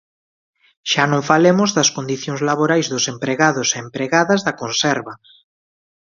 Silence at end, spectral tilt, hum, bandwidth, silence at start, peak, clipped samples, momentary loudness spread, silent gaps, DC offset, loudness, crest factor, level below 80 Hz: 0.9 s; -3.5 dB/octave; none; 7.6 kHz; 0.85 s; 0 dBFS; under 0.1%; 9 LU; none; under 0.1%; -17 LUFS; 18 dB; -62 dBFS